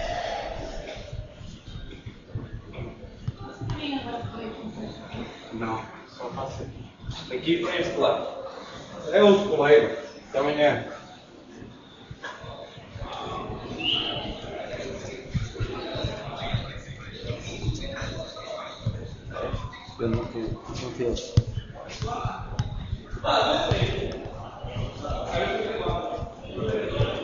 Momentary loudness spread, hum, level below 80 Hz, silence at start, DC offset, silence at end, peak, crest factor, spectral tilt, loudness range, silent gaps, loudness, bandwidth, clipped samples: 17 LU; none; -42 dBFS; 0 s; under 0.1%; 0 s; -4 dBFS; 24 dB; -4 dB/octave; 13 LU; none; -28 LUFS; 7.6 kHz; under 0.1%